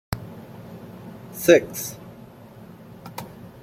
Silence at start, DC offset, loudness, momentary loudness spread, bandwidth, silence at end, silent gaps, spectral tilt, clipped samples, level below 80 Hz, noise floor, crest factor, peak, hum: 0.1 s; under 0.1%; -21 LUFS; 27 LU; 16.5 kHz; 0 s; none; -4.5 dB/octave; under 0.1%; -52 dBFS; -44 dBFS; 24 dB; -2 dBFS; none